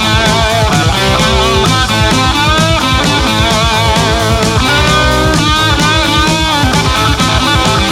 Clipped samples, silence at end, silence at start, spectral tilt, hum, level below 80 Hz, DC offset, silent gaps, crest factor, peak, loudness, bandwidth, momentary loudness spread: under 0.1%; 0 s; 0 s; -4 dB/octave; none; -20 dBFS; under 0.1%; none; 10 dB; 0 dBFS; -9 LUFS; 16.5 kHz; 1 LU